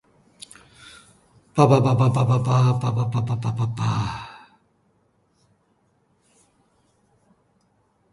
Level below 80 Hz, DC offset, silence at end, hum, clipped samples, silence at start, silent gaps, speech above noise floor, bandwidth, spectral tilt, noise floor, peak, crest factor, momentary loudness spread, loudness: -54 dBFS; under 0.1%; 3.75 s; none; under 0.1%; 0.85 s; none; 46 dB; 11.5 kHz; -7.5 dB/octave; -65 dBFS; -2 dBFS; 22 dB; 25 LU; -21 LUFS